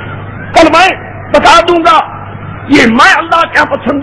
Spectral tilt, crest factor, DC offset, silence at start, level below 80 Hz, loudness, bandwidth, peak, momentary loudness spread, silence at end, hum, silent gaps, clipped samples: -4 dB/octave; 8 dB; under 0.1%; 0 s; -32 dBFS; -6 LUFS; 11 kHz; 0 dBFS; 18 LU; 0 s; none; none; 9%